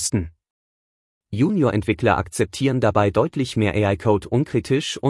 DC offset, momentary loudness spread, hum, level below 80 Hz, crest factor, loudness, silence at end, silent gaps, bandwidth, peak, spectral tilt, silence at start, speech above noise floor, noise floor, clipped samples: under 0.1%; 5 LU; none; -48 dBFS; 18 dB; -21 LUFS; 0 s; 0.50-1.21 s; 12 kHz; -4 dBFS; -6 dB/octave; 0 s; over 70 dB; under -90 dBFS; under 0.1%